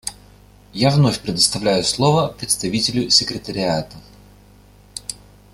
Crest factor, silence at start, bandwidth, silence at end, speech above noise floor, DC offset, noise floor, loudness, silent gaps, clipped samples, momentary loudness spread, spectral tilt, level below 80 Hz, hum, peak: 20 dB; 0.05 s; 15 kHz; 0.4 s; 29 dB; under 0.1%; -48 dBFS; -17 LUFS; none; under 0.1%; 16 LU; -4 dB/octave; -48 dBFS; 50 Hz at -40 dBFS; 0 dBFS